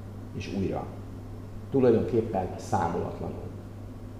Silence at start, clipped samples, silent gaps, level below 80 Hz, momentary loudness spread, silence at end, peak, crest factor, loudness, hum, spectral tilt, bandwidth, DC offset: 0 s; under 0.1%; none; -48 dBFS; 19 LU; 0 s; -10 dBFS; 20 dB; -29 LUFS; none; -8 dB/octave; 15 kHz; 0.2%